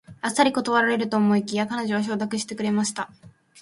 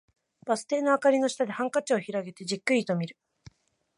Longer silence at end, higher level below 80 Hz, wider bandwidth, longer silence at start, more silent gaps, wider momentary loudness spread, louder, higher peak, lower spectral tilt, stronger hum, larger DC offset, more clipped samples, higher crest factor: second, 0 s vs 0.85 s; first, -66 dBFS vs -74 dBFS; about the same, 11.5 kHz vs 11.5 kHz; second, 0.1 s vs 0.45 s; neither; second, 7 LU vs 11 LU; first, -23 LUFS vs -27 LUFS; first, -4 dBFS vs -10 dBFS; about the same, -4.5 dB/octave vs -5 dB/octave; neither; neither; neither; about the same, 20 dB vs 18 dB